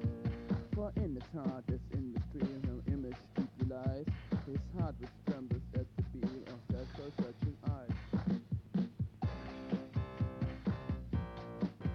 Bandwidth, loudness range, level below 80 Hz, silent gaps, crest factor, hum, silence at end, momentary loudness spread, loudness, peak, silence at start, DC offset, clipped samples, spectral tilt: 6.6 kHz; 1 LU; -50 dBFS; none; 16 dB; none; 0 s; 4 LU; -40 LUFS; -22 dBFS; 0 s; under 0.1%; under 0.1%; -9.5 dB/octave